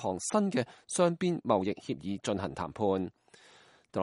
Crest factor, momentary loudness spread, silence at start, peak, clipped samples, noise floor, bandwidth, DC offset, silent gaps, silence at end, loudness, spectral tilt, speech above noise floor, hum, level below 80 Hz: 20 dB; 9 LU; 0 s; -12 dBFS; under 0.1%; -60 dBFS; 11.5 kHz; under 0.1%; none; 0 s; -32 LUFS; -5.5 dB/octave; 29 dB; none; -66 dBFS